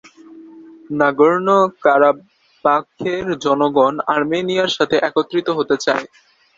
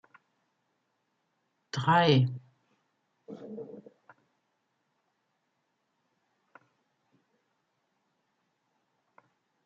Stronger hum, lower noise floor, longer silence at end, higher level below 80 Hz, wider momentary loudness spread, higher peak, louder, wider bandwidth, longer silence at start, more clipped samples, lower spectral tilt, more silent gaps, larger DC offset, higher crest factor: neither; second, -41 dBFS vs -79 dBFS; second, 0.5 s vs 5.85 s; first, -60 dBFS vs -78 dBFS; second, 8 LU vs 25 LU; first, 0 dBFS vs -12 dBFS; first, -17 LUFS vs -26 LUFS; about the same, 7.8 kHz vs 7.6 kHz; second, 0.3 s vs 1.75 s; neither; about the same, -5 dB/octave vs -4.5 dB/octave; neither; neither; second, 16 dB vs 24 dB